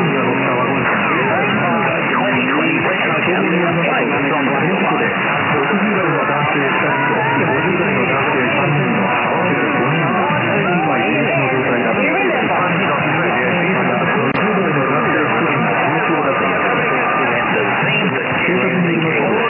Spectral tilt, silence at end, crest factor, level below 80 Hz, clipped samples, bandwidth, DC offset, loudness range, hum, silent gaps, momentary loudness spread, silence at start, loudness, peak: -2 dB/octave; 0 s; 12 dB; -54 dBFS; under 0.1%; 3.7 kHz; under 0.1%; 0 LU; none; none; 1 LU; 0 s; -15 LUFS; -4 dBFS